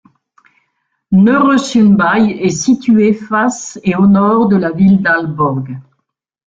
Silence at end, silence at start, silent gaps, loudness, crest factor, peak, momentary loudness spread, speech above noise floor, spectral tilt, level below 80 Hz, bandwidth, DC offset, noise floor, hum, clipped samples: 0.7 s; 1.1 s; none; -11 LUFS; 12 dB; 0 dBFS; 8 LU; 55 dB; -6 dB/octave; -48 dBFS; 7.8 kHz; under 0.1%; -66 dBFS; none; under 0.1%